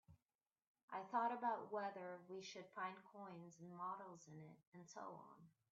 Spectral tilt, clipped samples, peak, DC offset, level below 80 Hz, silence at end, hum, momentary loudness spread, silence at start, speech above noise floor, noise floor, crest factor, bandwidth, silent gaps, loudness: -3.5 dB/octave; under 0.1%; -30 dBFS; under 0.1%; under -90 dBFS; 0.2 s; none; 18 LU; 0.1 s; over 40 dB; under -90 dBFS; 20 dB; 7.4 kHz; 0.35-0.39 s, 0.67-0.75 s, 0.83-0.88 s, 4.67-4.72 s; -50 LUFS